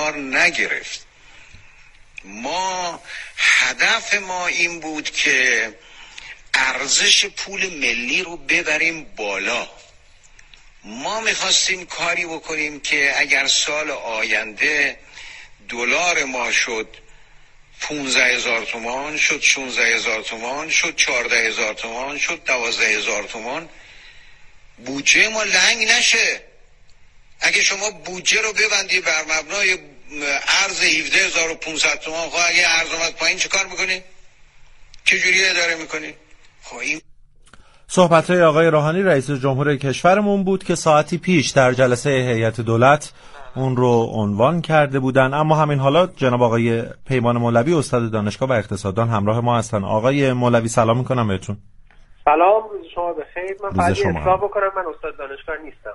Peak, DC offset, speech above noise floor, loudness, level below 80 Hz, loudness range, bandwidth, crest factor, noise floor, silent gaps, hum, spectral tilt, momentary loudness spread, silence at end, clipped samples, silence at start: 0 dBFS; under 0.1%; 29 dB; -17 LUFS; -48 dBFS; 4 LU; 11.5 kHz; 20 dB; -48 dBFS; none; none; -3 dB/octave; 13 LU; 0 s; under 0.1%; 0 s